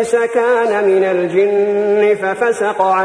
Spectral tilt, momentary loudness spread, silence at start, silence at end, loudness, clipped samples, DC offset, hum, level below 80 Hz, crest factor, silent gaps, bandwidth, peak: -5 dB/octave; 2 LU; 0 s; 0 s; -14 LUFS; under 0.1%; under 0.1%; none; -62 dBFS; 12 dB; none; 10.5 kHz; -2 dBFS